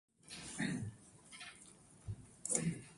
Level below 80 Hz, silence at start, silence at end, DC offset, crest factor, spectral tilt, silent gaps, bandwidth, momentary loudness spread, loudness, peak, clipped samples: -66 dBFS; 0.25 s; 0 s; under 0.1%; 28 dB; -3.5 dB/octave; none; 11.5 kHz; 20 LU; -43 LUFS; -18 dBFS; under 0.1%